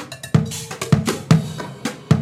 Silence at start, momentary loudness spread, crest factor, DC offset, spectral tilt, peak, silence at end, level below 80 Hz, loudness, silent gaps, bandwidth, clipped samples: 0 s; 11 LU; 18 dB; under 0.1%; -6 dB/octave; 0 dBFS; 0 s; -44 dBFS; -21 LUFS; none; 15.5 kHz; under 0.1%